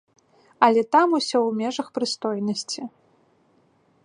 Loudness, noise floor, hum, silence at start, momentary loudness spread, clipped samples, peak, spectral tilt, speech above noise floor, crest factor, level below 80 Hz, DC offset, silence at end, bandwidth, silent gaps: -22 LUFS; -62 dBFS; none; 0.6 s; 12 LU; under 0.1%; -2 dBFS; -4 dB/octave; 40 dB; 22 dB; -76 dBFS; under 0.1%; 1.15 s; 11 kHz; none